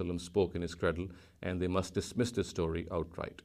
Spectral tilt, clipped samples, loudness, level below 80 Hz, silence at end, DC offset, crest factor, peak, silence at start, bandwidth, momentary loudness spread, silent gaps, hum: -6 dB/octave; under 0.1%; -35 LUFS; -52 dBFS; 0.1 s; under 0.1%; 18 dB; -16 dBFS; 0 s; 15 kHz; 8 LU; none; none